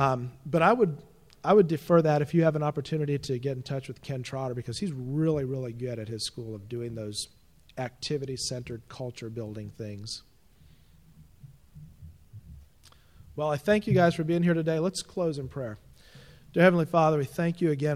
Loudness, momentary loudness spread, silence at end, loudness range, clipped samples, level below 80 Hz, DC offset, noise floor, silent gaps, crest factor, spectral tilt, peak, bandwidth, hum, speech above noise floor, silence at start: -28 LUFS; 17 LU; 0 s; 15 LU; under 0.1%; -58 dBFS; under 0.1%; -59 dBFS; none; 20 dB; -6.5 dB/octave; -8 dBFS; 15 kHz; none; 31 dB; 0 s